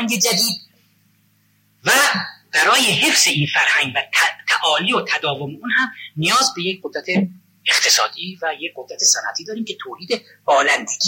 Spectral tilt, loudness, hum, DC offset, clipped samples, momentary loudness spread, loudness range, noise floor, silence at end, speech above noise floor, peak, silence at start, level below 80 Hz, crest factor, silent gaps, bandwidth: -1.5 dB/octave; -17 LUFS; none; under 0.1%; under 0.1%; 13 LU; 4 LU; -60 dBFS; 0 s; 41 dB; -2 dBFS; 0 s; -70 dBFS; 16 dB; none; 16.5 kHz